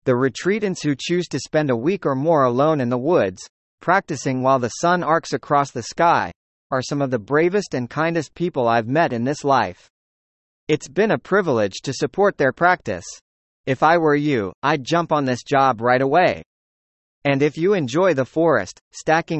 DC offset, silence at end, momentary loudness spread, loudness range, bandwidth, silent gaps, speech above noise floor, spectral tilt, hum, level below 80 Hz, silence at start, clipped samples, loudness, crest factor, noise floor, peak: under 0.1%; 0 s; 8 LU; 2 LU; 8.6 kHz; 3.49-3.78 s, 6.36-6.70 s, 9.90-10.67 s, 13.21-13.64 s, 14.54-14.62 s, 16.46-17.22 s, 18.81-18.91 s; over 71 dB; -5.5 dB/octave; none; -56 dBFS; 0.05 s; under 0.1%; -20 LUFS; 18 dB; under -90 dBFS; -2 dBFS